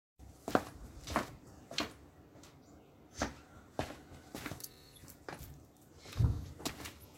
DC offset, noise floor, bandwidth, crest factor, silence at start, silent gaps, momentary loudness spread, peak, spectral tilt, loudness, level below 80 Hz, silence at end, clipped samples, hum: under 0.1%; -60 dBFS; 16.5 kHz; 32 dB; 0.2 s; none; 22 LU; -10 dBFS; -5 dB/octave; -41 LUFS; -52 dBFS; 0 s; under 0.1%; none